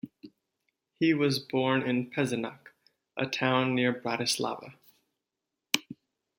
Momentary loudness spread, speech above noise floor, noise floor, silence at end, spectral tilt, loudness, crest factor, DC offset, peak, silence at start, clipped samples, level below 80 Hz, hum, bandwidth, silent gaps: 13 LU; 58 dB; -87 dBFS; 0.45 s; -4.5 dB/octave; -29 LUFS; 28 dB; under 0.1%; -2 dBFS; 0.05 s; under 0.1%; -74 dBFS; none; 16.5 kHz; none